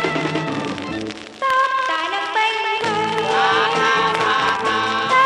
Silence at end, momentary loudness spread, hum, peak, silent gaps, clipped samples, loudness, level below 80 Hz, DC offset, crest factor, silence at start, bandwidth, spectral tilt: 0 s; 9 LU; none; -4 dBFS; none; under 0.1%; -19 LUFS; -58 dBFS; under 0.1%; 16 dB; 0 s; 11.5 kHz; -3.5 dB/octave